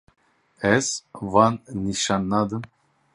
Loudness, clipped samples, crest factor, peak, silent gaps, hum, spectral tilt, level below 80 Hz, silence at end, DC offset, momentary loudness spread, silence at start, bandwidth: -23 LUFS; under 0.1%; 22 dB; -2 dBFS; none; none; -4.5 dB/octave; -52 dBFS; 0.5 s; under 0.1%; 11 LU; 0.6 s; 11.5 kHz